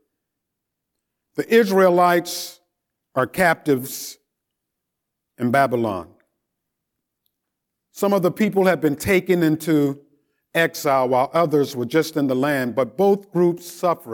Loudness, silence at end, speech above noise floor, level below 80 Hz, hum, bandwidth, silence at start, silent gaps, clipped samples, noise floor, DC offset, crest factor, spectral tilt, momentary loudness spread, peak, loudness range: -20 LUFS; 0 s; 62 dB; -60 dBFS; none; 19 kHz; 1.35 s; none; under 0.1%; -81 dBFS; under 0.1%; 18 dB; -5.5 dB/octave; 11 LU; -4 dBFS; 6 LU